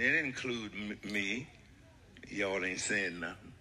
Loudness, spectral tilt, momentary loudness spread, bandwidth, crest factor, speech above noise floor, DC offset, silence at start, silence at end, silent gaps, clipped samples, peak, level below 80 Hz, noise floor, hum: -35 LUFS; -3 dB/octave; 12 LU; 14.5 kHz; 20 dB; 23 dB; under 0.1%; 0 s; 0 s; none; under 0.1%; -16 dBFS; -64 dBFS; -59 dBFS; none